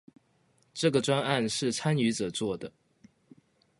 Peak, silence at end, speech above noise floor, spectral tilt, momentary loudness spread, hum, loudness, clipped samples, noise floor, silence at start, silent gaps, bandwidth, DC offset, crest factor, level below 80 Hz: -10 dBFS; 1.1 s; 40 dB; -4.5 dB/octave; 11 LU; none; -29 LUFS; under 0.1%; -68 dBFS; 0.75 s; none; 11.5 kHz; under 0.1%; 22 dB; -66 dBFS